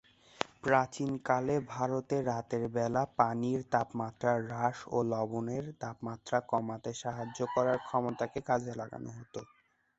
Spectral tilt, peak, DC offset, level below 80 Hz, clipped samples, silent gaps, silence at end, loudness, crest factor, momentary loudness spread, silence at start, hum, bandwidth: -6 dB/octave; -8 dBFS; under 0.1%; -66 dBFS; under 0.1%; none; 0.55 s; -34 LUFS; 26 dB; 11 LU; 0.4 s; none; 8.2 kHz